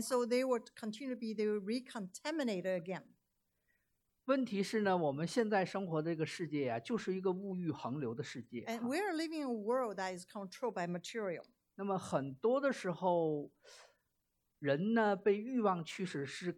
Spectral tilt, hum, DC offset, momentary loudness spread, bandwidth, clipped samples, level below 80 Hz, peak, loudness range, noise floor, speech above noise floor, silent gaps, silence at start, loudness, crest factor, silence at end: -5.5 dB/octave; none; under 0.1%; 10 LU; 14.5 kHz; under 0.1%; -84 dBFS; -18 dBFS; 4 LU; -83 dBFS; 46 dB; none; 0 s; -37 LUFS; 18 dB; 0 s